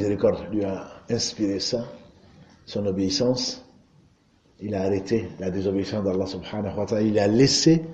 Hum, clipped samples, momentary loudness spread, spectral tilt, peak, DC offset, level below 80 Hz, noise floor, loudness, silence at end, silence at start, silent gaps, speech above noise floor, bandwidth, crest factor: none; under 0.1%; 12 LU; -5 dB/octave; -6 dBFS; under 0.1%; -54 dBFS; -60 dBFS; -24 LUFS; 0 s; 0 s; none; 37 dB; 9.4 kHz; 18 dB